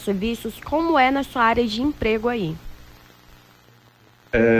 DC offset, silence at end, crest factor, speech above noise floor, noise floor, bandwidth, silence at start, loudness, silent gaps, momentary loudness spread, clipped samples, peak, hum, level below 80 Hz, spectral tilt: under 0.1%; 0 s; 16 dB; 33 dB; -53 dBFS; 16 kHz; 0 s; -21 LUFS; none; 10 LU; under 0.1%; -6 dBFS; 60 Hz at -45 dBFS; -42 dBFS; -6 dB/octave